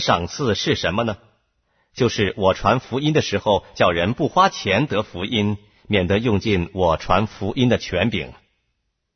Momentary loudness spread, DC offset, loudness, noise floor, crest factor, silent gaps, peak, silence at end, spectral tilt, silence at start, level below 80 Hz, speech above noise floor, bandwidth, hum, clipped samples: 7 LU; under 0.1%; -20 LUFS; -73 dBFS; 18 dB; none; -2 dBFS; 0.8 s; -5.5 dB/octave; 0 s; -42 dBFS; 53 dB; 6.6 kHz; none; under 0.1%